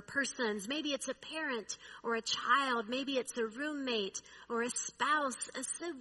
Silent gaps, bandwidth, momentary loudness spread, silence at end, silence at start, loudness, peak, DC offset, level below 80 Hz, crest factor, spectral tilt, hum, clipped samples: none; 11.5 kHz; 10 LU; 0 s; 0 s; -36 LUFS; -16 dBFS; under 0.1%; -76 dBFS; 20 dB; -1.5 dB/octave; none; under 0.1%